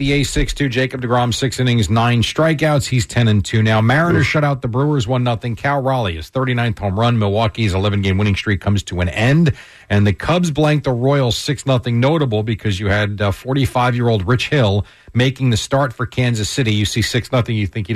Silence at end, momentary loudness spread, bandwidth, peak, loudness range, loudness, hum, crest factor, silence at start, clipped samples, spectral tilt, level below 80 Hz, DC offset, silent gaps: 0 s; 5 LU; 13.5 kHz; -6 dBFS; 2 LU; -17 LUFS; none; 10 dB; 0 s; under 0.1%; -6 dB/octave; -36 dBFS; under 0.1%; none